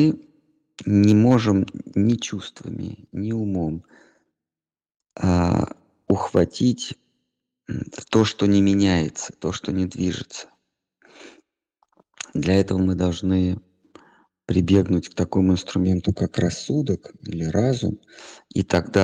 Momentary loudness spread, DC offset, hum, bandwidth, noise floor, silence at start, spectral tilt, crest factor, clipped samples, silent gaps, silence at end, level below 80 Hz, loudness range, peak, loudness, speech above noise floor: 15 LU; under 0.1%; none; 9.6 kHz; under -90 dBFS; 0 s; -6.5 dB/octave; 20 dB; under 0.1%; none; 0 s; -48 dBFS; 6 LU; -4 dBFS; -22 LUFS; over 69 dB